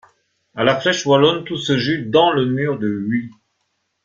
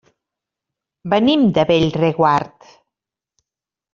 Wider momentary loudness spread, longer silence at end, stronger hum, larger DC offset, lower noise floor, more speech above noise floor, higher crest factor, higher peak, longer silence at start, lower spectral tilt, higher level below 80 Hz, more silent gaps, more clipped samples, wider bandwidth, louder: about the same, 9 LU vs 10 LU; second, 0.75 s vs 1.45 s; neither; neither; second, -70 dBFS vs -88 dBFS; second, 53 dB vs 73 dB; about the same, 18 dB vs 16 dB; about the same, -2 dBFS vs -2 dBFS; second, 0.55 s vs 1.05 s; about the same, -5 dB/octave vs -5 dB/octave; second, -58 dBFS vs -52 dBFS; neither; neither; about the same, 7.6 kHz vs 7.4 kHz; about the same, -17 LUFS vs -16 LUFS